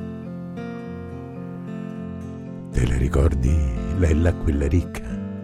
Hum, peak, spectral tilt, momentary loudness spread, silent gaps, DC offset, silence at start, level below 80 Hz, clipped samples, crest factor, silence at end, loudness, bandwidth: none; -6 dBFS; -8 dB/octave; 14 LU; none; under 0.1%; 0 s; -26 dBFS; under 0.1%; 16 dB; 0 s; -25 LUFS; 11 kHz